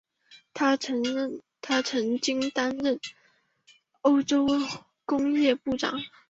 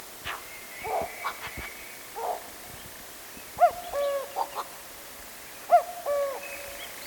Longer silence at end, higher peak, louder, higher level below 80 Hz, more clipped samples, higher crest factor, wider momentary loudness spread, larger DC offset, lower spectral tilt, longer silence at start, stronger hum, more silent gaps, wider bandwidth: first, 0.2 s vs 0 s; about the same, -10 dBFS vs -8 dBFS; first, -27 LUFS vs -31 LUFS; second, -66 dBFS vs -58 dBFS; neither; about the same, 18 dB vs 22 dB; second, 11 LU vs 17 LU; neither; first, -3.5 dB/octave vs -2 dB/octave; first, 0.3 s vs 0 s; neither; neither; second, 7.8 kHz vs 19 kHz